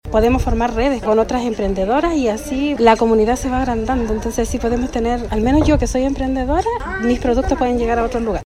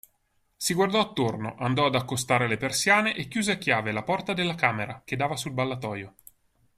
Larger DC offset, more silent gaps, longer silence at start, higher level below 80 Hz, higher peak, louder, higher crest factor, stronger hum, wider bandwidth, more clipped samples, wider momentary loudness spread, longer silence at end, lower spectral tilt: neither; neither; second, 0.05 s vs 0.6 s; first, -26 dBFS vs -60 dBFS; first, 0 dBFS vs -6 dBFS; first, -17 LUFS vs -26 LUFS; second, 16 dB vs 22 dB; neither; about the same, 14.5 kHz vs 15.5 kHz; neither; second, 6 LU vs 9 LU; second, 0.05 s vs 0.7 s; first, -6 dB/octave vs -4 dB/octave